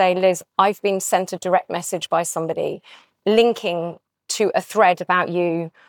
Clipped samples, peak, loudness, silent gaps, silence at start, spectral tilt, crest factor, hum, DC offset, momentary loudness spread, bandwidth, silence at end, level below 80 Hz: under 0.1%; -4 dBFS; -20 LUFS; none; 0 s; -4 dB/octave; 16 dB; none; under 0.1%; 10 LU; 19.5 kHz; 0.2 s; -70 dBFS